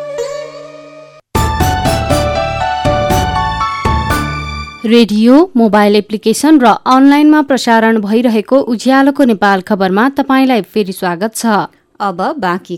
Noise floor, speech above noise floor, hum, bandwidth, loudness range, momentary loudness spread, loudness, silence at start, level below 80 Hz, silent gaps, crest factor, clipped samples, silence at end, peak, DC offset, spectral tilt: -36 dBFS; 26 dB; none; 19 kHz; 6 LU; 12 LU; -11 LUFS; 0 s; -28 dBFS; none; 10 dB; under 0.1%; 0 s; 0 dBFS; under 0.1%; -5.5 dB/octave